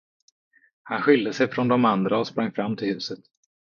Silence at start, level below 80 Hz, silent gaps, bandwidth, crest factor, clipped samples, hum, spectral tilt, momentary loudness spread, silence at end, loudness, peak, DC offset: 0.85 s; -70 dBFS; none; 7.2 kHz; 20 dB; under 0.1%; none; -6.5 dB/octave; 11 LU; 0.55 s; -23 LUFS; -4 dBFS; under 0.1%